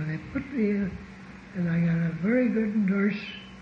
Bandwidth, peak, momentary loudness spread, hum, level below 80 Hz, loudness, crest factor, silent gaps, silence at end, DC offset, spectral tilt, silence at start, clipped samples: 6.8 kHz; -14 dBFS; 14 LU; none; -54 dBFS; -27 LUFS; 14 dB; none; 0 s; under 0.1%; -9 dB/octave; 0 s; under 0.1%